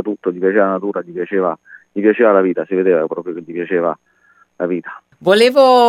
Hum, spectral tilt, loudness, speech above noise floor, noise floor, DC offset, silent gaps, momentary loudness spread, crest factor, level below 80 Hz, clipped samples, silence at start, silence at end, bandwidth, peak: none; -5.5 dB/octave; -16 LUFS; 39 dB; -54 dBFS; under 0.1%; none; 14 LU; 14 dB; -72 dBFS; under 0.1%; 0 s; 0 s; 14.5 kHz; 0 dBFS